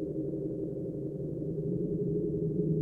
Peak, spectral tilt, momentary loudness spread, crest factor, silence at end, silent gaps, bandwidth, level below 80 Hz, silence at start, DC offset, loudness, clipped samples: -20 dBFS; -13.5 dB/octave; 5 LU; 14 dB; 0 s; none; 1.5 kHz; -54 dBFS; 0 s; under 0.1%; -34 LUFS; under 0.1%